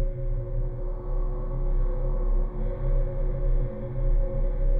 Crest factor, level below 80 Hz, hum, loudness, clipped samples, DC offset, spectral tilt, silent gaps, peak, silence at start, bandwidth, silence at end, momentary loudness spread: 10 dB; -24 dBFS; none; -31 LUFS; under 0.1%; under 0.1%; -12 dB/octave; none; -14 dBFS; 0 s; 2.3 kHz; 0 s; 4 LU